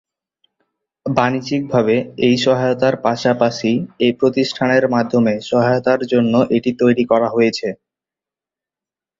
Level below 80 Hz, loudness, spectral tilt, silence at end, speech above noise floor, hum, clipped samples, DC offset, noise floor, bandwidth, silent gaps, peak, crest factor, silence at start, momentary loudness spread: -56 dBFS; -16 LUFS; -6 dB/octave; 1.45 s; 73 dB; none; under 0.1%; under 0.1%; -89 dBFS; 7.8 kHz; none; -2 dBFS; 16 dB; 1.05 s; 5 LU